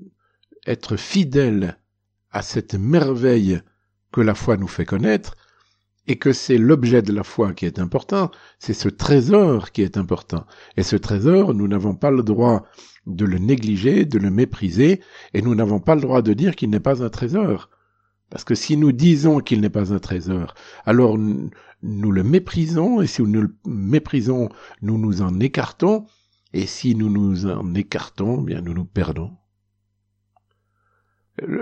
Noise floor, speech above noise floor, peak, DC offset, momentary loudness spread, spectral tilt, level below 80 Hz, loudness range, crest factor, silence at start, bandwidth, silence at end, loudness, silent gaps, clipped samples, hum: -72 dBFS; 54 dB; -2 dBFS; under 0.1%; 12 LU; -7.5 dB/octave; -46 dBFS; 4 LU; 18 dB; 0.65 s; 8.4 kHz; 0 s; -19 LUFS; none; under 0.1%; 50 Hz at -45 dBFS